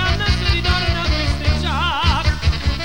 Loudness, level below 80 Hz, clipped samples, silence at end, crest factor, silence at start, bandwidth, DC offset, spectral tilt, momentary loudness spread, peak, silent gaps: -18 LUFS; -22 dBFS; under 0.1%; 0 s; 12 dB; 0 s; 15 kHz; 2%; -5 dB/octave; 2 LU; -6 dBFS; none